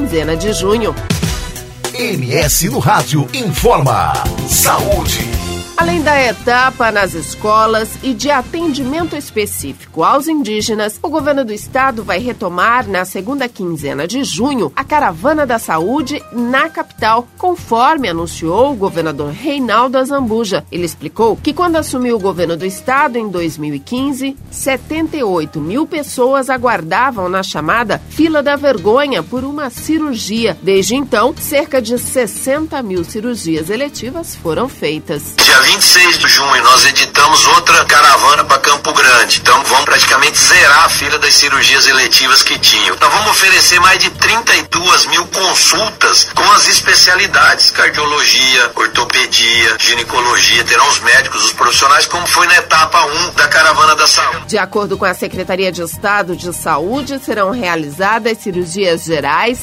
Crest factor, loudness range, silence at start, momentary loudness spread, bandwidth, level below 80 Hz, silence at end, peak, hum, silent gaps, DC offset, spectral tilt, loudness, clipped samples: 12 dB; 9 LU; 0 s; 13 LU; over 20 kHz; -36 dBFS; 0 s; 0 dBFS; none; none; under 0.1%; -2 dB/octave; -10 LUFS; 0.2%